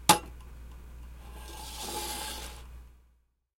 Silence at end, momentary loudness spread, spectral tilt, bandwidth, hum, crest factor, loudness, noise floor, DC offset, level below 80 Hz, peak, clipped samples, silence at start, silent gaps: 0.6 s; 20 LU; -2 dB/octave; 16.5 kHz; none; 34 dB; -33 LUFS; -69 dBFS; under 0.1%; -48 dBFS; -2 dBFS; under 0.1%; 0 s; none